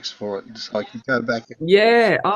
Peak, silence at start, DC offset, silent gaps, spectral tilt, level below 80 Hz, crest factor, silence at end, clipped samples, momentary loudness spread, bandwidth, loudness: -2 dBFS; 0.05 s; under 0.1%; none; -5 dB/octave; -64 dBFS; 16 dB; 0 s; under 0.1%; 15 LU; 11.5 kHz; -19 LUFS